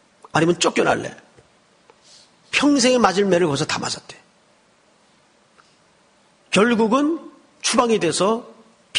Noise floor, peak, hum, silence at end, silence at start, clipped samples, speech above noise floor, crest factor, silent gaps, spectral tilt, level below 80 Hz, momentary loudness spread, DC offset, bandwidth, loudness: -57 dBFS; 0 dBFS; none; 0 s; 0.35 s; under 0.1%; 39 dB; 20 dB; none; -4 dB/octave; -58 dBFS; 9 LU; under 0.1%; 10 kHz; -19 LUFS